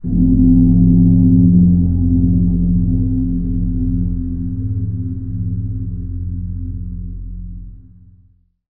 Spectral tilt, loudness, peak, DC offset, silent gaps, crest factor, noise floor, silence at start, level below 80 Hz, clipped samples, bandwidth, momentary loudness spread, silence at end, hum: -17 dB/octave; -15 LUFS; 0 dBFS; 2%; none; 14 dB; -52 dBFS; 0.05 s; -22 dBFS; under 0.1%; 0.9 kHz; 17 LU; 0.05 s; none